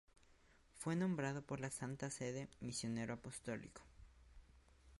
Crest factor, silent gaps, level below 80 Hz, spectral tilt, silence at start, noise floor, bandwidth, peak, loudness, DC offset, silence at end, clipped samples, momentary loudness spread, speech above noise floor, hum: 16 dB; none; -68 dBFS; -5 dB/octave; 0.3 s; -70 dBFS; 11.5 kHz; -30 dBFS; -45 LUFS; under 0.1%; 0.05 s; under 0.1%; 9 LU; 25 dB; none